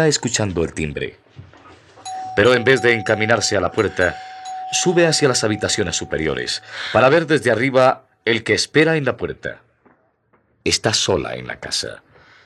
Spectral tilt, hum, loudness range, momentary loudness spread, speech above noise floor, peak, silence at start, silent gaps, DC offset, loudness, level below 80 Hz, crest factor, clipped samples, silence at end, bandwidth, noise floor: -3.5 dB/octave; none; 3 LU; 14 LU; 43 dB; -2 dBFS; 0 s; none; under 0.1%; -18 LUFS; -50 dBFS; 18 dB; under 0.1%; 0.5 s; 13 kHz; -61 dBFS